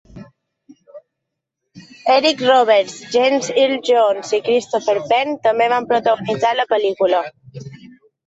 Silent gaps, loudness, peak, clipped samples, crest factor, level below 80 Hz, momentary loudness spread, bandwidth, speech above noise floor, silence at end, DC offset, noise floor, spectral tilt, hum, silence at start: none; -16 LUFS; -2 dBFS; under 0.1%; 16 dB; -62 dBFS; 7 LU; 8 kHz; 63 dB; 0.4 s; under 0.1%; -79 dBFS; -3.5 dB/octave; none; 0.15 s